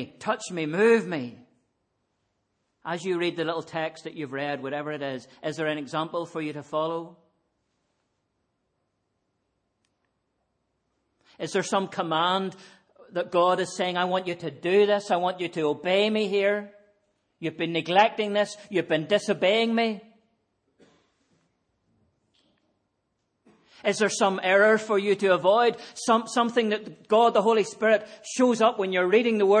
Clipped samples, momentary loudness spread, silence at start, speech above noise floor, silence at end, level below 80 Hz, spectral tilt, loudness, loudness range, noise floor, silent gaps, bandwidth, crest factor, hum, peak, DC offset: under 0.1%; 12 LU; 0 s; 52 dB; 0 s; -78 dBFS; -4.5 dB/octave; -25 LUFS; 11 LU; -77 dBFS; none; 10 kHz; 20 dB; none; -6 dBFS; under 0.1%